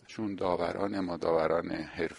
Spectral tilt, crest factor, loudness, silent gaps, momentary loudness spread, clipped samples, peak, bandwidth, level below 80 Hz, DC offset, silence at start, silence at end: -6.5 dB/octave; 18 dB; -32 LUFS; none; 7 LU; under 0.1%; -14 dBFS; 11.5 kHz; -60 dBFS; under 0.1%; 0.1 s; 0 s